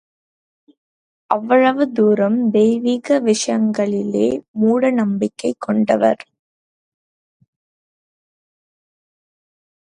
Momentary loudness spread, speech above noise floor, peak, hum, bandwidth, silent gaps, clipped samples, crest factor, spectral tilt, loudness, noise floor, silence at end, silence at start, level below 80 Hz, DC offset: 6 LU; over 74 dB; 0 dBFS; none; 11 kHz; 4.48-4.54 s; under 0.1%; 18 dB; -5.5 dB/octave; -17 LUFS; under -90 dBFS; 3.65 s; 1.3 s; -64 dBFS; under 0.1%